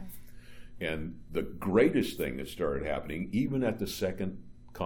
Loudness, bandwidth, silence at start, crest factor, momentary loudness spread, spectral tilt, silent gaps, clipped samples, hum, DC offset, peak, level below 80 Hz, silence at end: -32 LUFS; over 20 kHz; 0 s; 20 dB; 13 LU; -6 dB/octave; none; under 0.1%; none; under 0.1%; -12 dBFS; -50 dBFS; 0 s